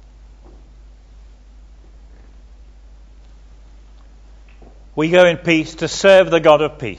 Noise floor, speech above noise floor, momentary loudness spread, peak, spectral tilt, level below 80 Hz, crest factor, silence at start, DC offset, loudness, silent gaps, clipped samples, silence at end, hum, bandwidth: -42 dBFS; 29 dB; 11 LU; 0 dBFS; -4.5 dB/octave; -42 dBFS; 18 dB; 4.95 s; under 0.1%; -13 LUFS; none; under 0.1%; 0 s; none; 9 kHz